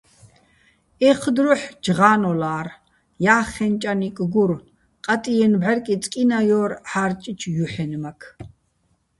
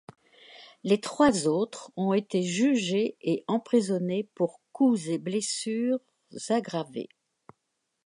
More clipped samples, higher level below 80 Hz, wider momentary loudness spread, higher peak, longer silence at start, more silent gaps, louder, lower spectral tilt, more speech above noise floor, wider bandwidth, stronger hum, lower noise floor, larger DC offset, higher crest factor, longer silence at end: neither; first, -54 dBFS vs -68 dBFS; about the same, 12 LU vs 10 LU; first, 0 dBFS vs -8 dBFS; first, 1 s vs 0.5 s; neither; first, -20 LUFS vs -28 LUFS; about the same, -6 dB/octave vs -5 dB/octave; second, 47 dB vs 53 dB; about the same, 11.5 kHz vs 11.5 kHz; neither; second, -66 dBFS vs -80 dBFS; neither; about the same, 20 dB vs 20 dB; second, 0.7 s vs 1 s